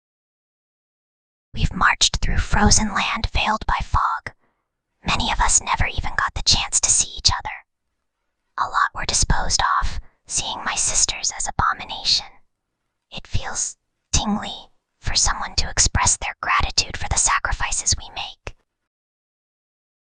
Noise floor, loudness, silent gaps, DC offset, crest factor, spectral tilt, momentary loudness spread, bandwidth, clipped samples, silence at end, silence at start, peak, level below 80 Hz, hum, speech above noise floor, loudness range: -77 dBFS; -20 LUFS; none; under 0.1%; 22 dB; -1.5 dB/octave; 15 LU; 10 kHz; under 0.1%; 1.65 s; 1.55 s; -2 dBFS; -30 dBFS; none; 56 dB; 5 LU